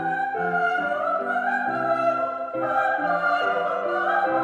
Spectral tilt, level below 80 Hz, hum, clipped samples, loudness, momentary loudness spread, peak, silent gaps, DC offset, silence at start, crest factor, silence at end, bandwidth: -6 dB/octave; -72 dBFS; none; under 0.1%; -23 LUFS; 3 LU; -10 dBFS; none; under 0.1%; 0 s; 14 dB; 0 s; 9 kHz